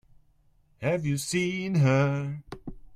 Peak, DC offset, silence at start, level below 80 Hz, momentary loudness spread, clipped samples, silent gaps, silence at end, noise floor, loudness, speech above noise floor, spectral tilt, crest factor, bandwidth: -10 dBFS; under 0.1%; 0.8 s; -54 dBFS; 17 LU; under 0.1%; none; 0 s; -63 dBFS; -27 LUFS; 37 dB; -6 dB/octave; 18 dB; 14 kHz